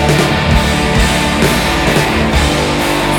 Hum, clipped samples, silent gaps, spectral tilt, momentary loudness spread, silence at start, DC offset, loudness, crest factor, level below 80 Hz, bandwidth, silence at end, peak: none; under 0.1%; none; -4.5 dB/octave; 1 LU; 0 s; under 0.1%; -12 LUFS; 12 dB; -20 dBFS; 19 kHz; 0 s; 0 dBFS